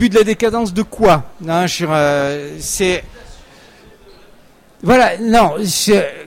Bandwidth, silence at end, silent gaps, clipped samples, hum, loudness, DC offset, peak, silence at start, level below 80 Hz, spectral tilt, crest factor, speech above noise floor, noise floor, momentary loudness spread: 16.5 kHz; 0.05 s; none; under 0.1%; none; -15 LUFS; under 0.1%; -2 dBFS; 0 s; -38 dBFS; -4.5 dB/octave; 14 dB; 31 dB; -45 dBFS; 9 LU